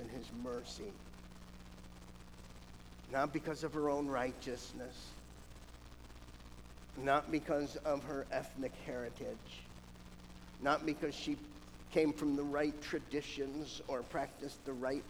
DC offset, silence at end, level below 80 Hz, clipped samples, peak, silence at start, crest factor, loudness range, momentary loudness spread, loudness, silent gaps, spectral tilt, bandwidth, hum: under 0.1%; 0 s; -58 dBFS; under 0.1%; -18 dBFS; 0 s; 22 dB; 5 LU; 21 LU; -40 LUFS; none; -5 dB/octave; over 20 kHz; 60 Hz at -60 dBFS